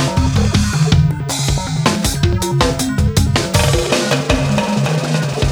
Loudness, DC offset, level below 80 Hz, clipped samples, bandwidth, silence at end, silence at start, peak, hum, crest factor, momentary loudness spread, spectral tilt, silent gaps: -15 LUFS; under 0.1%; -24 dBFS; under 0.1%; over 20 kHz; 0 s; 0 s; 0 dBFS; none; 14 dB; 3 LU; -5 dB/octave; none